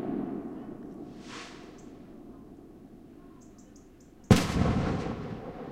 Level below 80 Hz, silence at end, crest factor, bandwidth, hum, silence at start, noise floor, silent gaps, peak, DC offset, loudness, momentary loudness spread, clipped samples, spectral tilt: -46 dBFS; 0 s; 28 dB; 16 kHz; none; 0 s; -53 dBFS; none; -6 dBFS; under 0.1%; -30 LUFS; 27 LU; under 0.1%; -6.5 dB/octave